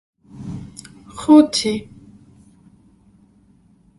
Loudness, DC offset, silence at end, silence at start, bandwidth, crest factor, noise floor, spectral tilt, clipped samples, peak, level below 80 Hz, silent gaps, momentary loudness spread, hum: -15 LUFS; under 0.1%; 2.15 s; 0.4 s; 11.5 kHz; 20 dB; -54 dBFS; -4.5 dB/octave; under 0.1%; 0 dBFS; -52 dBFS; none; 26 LU; none